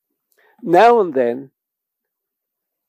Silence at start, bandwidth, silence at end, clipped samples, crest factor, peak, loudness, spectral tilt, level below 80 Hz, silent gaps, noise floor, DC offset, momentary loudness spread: 0.65 s; 14.5 kHz; 1.45 s; under 0.1%; 16 dB; -2 dBFS; -14 LUFS; -6 dB/octave; -72 dBFS; none; -82 dBFS; under 0.1%; 19 LU